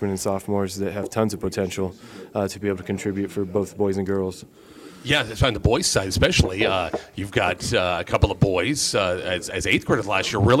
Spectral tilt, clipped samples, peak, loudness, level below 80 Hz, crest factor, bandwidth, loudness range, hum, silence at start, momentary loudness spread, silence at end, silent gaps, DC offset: -4.5 dB/octave; under 0.1%; -4 dBFS; -23 LUFS; -38 dBFS; 20 dB; 16 kHz; 5 LU; none; 0 s; 8 LU; 0 s; none; under 0.1%